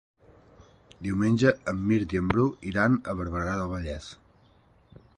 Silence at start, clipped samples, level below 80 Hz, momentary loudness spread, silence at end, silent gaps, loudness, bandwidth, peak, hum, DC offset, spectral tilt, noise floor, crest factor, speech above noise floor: 1 s; under 0.1%; -46 dBFS; 13 LU; 1.05 s; none; -27 LUFS; 11 kHz; -8 dBFS; none; under 0.1%; -7.5 dB/octave; -60 dBFS; 20 dB; 34 dB